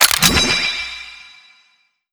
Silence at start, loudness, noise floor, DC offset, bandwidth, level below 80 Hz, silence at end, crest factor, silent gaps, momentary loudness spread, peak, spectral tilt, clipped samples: 0 s; -14 LUFS; -60 dBFS; under 0.1%; over 20 kHz; -36 dBFS; 0.85 s; 20 dB; none; 20 LU; 0 dBFS; -1 dB/octave; under 0.1%